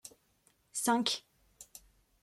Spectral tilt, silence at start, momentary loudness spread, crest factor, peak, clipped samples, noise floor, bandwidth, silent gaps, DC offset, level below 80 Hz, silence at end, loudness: -2 dB/octave; 0.05 s; 25 LU; 22 dB; -16 dBFS; under 0.1%; -72 dBFS; 15.5 kHz; none; under 0.1%; -74 dBFS; 0.45 s; -33 LUFS